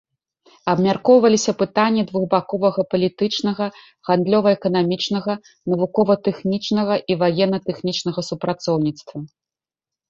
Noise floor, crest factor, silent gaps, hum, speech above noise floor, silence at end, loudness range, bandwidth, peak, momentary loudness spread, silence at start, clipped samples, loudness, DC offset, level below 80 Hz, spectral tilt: -90 dBFS; 18 dB; none; none; 71 dB; 0.85 s; 3 LU; 7.8 kHz; -2 dBFS; 10 LU; 0.65 s; under 0.1%; -19 LUFS; under 0.1%; -60 dBFS; -5.5 dB/octave